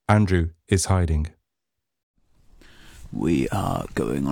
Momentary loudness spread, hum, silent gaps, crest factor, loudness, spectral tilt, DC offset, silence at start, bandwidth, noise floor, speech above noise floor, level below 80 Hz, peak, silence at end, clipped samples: 8 LU; none; 2.03-2.14 s; 20 dB; -23 LUFS; -6 dB/octave; under 0.1%; 0.1 s; 16.5 kHz; -84 dBFS; 62 dB; -36 dBFS; -4 dBFS; 0 s; under 0.1%